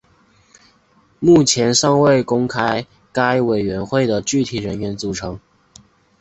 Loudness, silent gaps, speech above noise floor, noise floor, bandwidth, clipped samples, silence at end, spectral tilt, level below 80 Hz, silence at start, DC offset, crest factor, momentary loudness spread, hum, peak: -17 LUFS; none; 40 dB; -56 dBFS; 8.2 kHz; under 0.1%; 0.85 s; -4.5 dB/octave; -48 dBFS; 1.2 s; under 0.1%; 16 dB; 12 LU; none; -2 dBFS